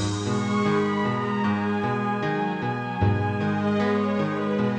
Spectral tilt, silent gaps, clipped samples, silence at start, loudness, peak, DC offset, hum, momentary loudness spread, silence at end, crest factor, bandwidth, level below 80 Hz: -6.5 dB/octave; none; under 0.1%; 0 s; -25 LUFS; -10 dBFS; under 0.1%; none; 3 LU; 0 s; 14 dB; 9.2 kHz; -50 dBFS